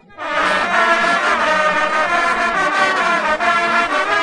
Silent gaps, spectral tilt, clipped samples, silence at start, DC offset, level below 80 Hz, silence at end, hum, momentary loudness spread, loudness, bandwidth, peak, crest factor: none; -2.5 dB/octave; under 0.1%; 0.15 s; under 0.1%; -50 dBFS; 0 s; none; 2 LU; -15 LUFS; 11.5 kHz; 0 dBFS; 16 dB